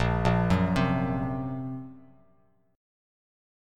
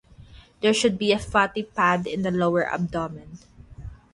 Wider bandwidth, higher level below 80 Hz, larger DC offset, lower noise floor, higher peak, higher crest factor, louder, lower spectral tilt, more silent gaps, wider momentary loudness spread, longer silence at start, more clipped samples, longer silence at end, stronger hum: second, 10 kHz vs 11.5 kHz; first, -42 dBFS vs -48 dBFS; neither; first, -66 dBFS vs -48 dBFS; second, -10 dBFS vs -6 dBFS; about the same, 20 dB vs 20 dB; second, -27 LUFS vs -23 LUFS; first, -7.5 dB/octave vs -5 dB/octave; neither; second, 14 LU vs 20 LU; second, 0 s vs 0.2 s; neither; first, 1.75 s vs 0.2 s; neither